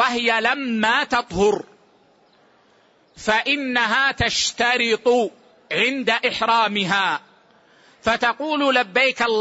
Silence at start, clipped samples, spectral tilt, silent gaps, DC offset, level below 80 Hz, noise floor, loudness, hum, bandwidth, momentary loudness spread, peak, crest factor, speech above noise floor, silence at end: 0 s; under 0.1%; -3 dB/octave; none; under 0.1%; -50 dBFS; -57 dBFS; -19 LUFS; none; 8 kHz; 5 LU; -6 dBFS; 16 dB; 37 dB; 0 s